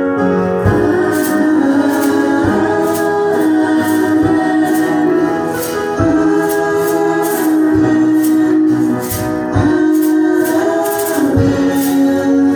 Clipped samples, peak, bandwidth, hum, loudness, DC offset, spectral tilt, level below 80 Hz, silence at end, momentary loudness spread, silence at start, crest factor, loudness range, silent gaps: under 0.1%; 0 dBFS; over 20 kHz; none; -13 LUFS; under 0.1%; -6 dB/octave; -38 dBFS; 0 s; 3 LU; 0 s; 12 dB; 1 LU; none